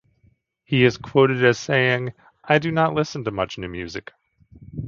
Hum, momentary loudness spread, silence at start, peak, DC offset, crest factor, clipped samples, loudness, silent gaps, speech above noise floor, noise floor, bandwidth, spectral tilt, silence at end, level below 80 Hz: none; 15 LU; 0.7 s; 0 dBFS; under 0.1%; 22 dB; under 0.1%; -21 LUFS; none; 41 dB; -61 dBFS; 7.4 kHz; -6 dB/octave; 0 s; -52 dBFS